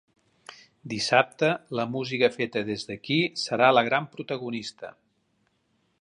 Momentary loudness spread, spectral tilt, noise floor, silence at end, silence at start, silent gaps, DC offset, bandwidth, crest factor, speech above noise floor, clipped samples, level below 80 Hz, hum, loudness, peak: 15 LU; -4.5 dB/octave; -71 dBFS; 1.1 s; 0.5 s; none; under 0.1%; 11.5 kHz; 24 dB; 45 dB; under 0.1%; -70 dBFS; none; -25 LUFS; -4 dBFS